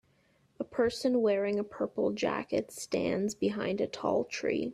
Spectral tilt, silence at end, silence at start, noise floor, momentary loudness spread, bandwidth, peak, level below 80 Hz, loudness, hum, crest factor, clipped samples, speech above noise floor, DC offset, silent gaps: -5 dB/octave; 0 s; 0.6 s; -69 dBFS; 6 LU; 14.5 kHz; -16 dBFS; -66 dBFS; -32 LUFS; none; 16 dB; under 0.1%; 38 dB; under 0.1%; none